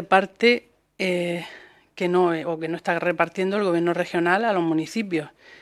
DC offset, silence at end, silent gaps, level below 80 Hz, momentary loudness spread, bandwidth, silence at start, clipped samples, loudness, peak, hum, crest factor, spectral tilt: under 0.1%; 0.05 s; none; -70 dBFS; 9 LU; 12.5 kHz; 0 s; under 0.1%; -23 LUFS; -2 dBFS; none; 22 dB; -6 dB/octave